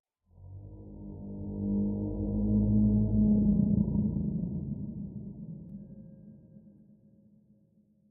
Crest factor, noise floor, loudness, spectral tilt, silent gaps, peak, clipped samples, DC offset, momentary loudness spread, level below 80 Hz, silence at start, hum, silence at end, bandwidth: 16 dB; -66 dBFS; -29 LUFS; -18 dB/octave; none; -14 dBFS; under 0.1%; under 0.1%; 22 LU; -42 dBFS; 0.4 s; none; 1.4 s; 1.1 kHz